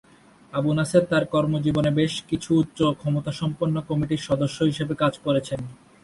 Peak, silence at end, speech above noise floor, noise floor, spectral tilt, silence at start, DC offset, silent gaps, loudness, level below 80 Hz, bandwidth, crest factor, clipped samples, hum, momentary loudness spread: -4 dBFS; 0.3 s; 28 dB; -51 dBFS; -6.5 dB/octave; 0.55 s; under 0.1%; none; -24 LUFS; -52 dBFS; 11.5 kHz; 20 dB; under 0.1%; none; 7 LU